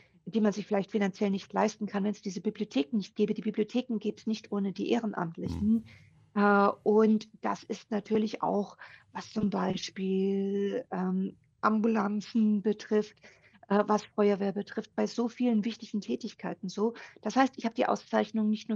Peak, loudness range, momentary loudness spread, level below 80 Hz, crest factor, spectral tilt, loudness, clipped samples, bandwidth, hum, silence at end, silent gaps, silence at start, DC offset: -10 dBFS; 4 LU; 9 LU; -64 dBFS; 20 dB; -6.5 dB/octave; -30 LUFS; under 0.1%; 7.4 kHz; none; 0 s; none; 0.25 s; under 0.1%